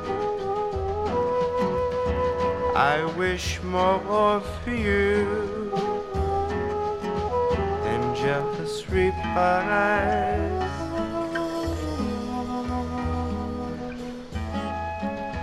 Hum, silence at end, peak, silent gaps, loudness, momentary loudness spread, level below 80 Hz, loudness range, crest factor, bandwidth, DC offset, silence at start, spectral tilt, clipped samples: none; 0 s; -6 dBFS; none; -26 LUFS; 8 LU; -38 dBFS; 6 LU; 18 dB; 13.5 kHz; under 0.1%; 0 s; -6 dB/octave; under 0.1%